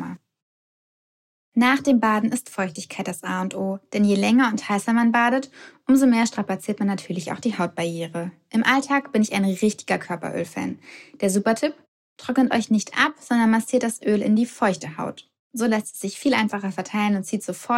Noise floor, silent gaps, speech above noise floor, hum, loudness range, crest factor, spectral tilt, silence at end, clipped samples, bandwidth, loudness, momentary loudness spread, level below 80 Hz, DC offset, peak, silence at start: under -90 dBFS; 0.42-1.52 s, 11.88-12.16 s, 15.39-15.51 s; over 68 dB; none; 4 LU; 18 dB; -5 dB/octave; 0 s; under 0.1%; 15 kHz; -22 LUFS; 12 LU; -68 dBFS; under 0.1%; -4 dBFS; 0 s